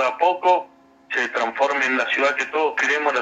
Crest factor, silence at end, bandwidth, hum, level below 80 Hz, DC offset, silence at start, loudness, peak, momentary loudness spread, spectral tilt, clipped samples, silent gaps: 16 dB; 0 s; 8.8 kHz; none; -74 dBFS; under 0.1%; 0 s; -20 LUFS; -6 dBFS; 4 LU; -1.5 dB/octave; under 0.1%; none